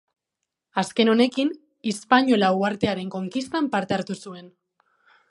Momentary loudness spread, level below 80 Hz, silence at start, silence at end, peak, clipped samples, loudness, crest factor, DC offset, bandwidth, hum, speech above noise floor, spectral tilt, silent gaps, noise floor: 13 LU; -62 dBFS; 0.75 s; 0.8 s; -2 dBFS; under 0.1%; -23 LUFS; 22 dB; under 0.1%; 11.5 kHz; none; 61 dB; -5 dB/octave; none; -83 dBFS